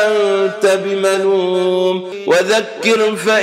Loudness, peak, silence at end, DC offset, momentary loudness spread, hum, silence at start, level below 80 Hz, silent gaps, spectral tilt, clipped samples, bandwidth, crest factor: -15 LUFS; 0 dBFS; 0 s; under 0.1%; 3 LU; none; 0 s; -74 dBFS; none; -3.5 dB/octave; under 0.1%; 15 kHz; 14 dB